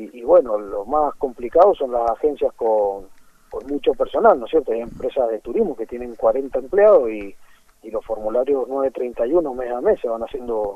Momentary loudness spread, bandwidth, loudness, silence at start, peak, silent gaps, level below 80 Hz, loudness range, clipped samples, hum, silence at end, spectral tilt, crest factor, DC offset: 12 LU; 7 kHz; -20 LUFS; 0 s; -2 dBFS; none; -46 dBFS; 3 LU; under 0.1%; none; 0 s; -7 dB/octave; 18 dB; under 0.1%